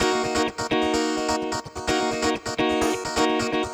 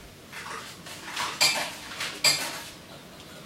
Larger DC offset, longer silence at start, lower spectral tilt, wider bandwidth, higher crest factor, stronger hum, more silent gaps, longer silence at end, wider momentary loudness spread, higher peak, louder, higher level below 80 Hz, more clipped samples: neither; about the same, 0 s vs 0 s; first, -3.5 dB/octave vs 0 dB/octave; first, over 20 kHz vs 16 kHz; second, 14 dB vs 24 dB; neither; neither; about the same, 0 s vs 0 s; second, 3 LU vs 22 LU; about the same, -8 dBFS vs -8 dBFS; about the same, -24 LUFS vs -26 LUFS; first, -46 dBFS vs -62 dBFS; neither